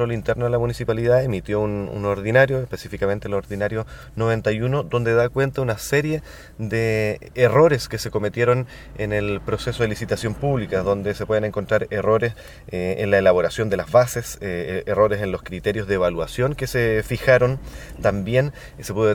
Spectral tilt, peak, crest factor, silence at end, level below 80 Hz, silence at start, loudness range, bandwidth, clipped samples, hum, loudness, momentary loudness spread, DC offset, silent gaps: -6 dB/octave; -2 dBFS; 20 dB; 0 s; -42 dBFS; 0 s; 2 LU; 18.5 kHz; under 0.1%; none; -21 LUFS; 10 LU; under 0.1%; none